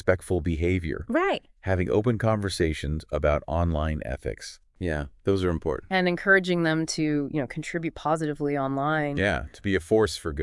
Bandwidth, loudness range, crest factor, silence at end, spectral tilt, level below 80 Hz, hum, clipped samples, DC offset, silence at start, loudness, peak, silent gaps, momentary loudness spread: 12 kHz; 3 LU; 20 dB; 0 s; -6 dB/octave; -42 dBFS; none; under 0.1%; under 0.1%; 0.05 s; -26 LUFS; -6 dBFS; none; 8 LU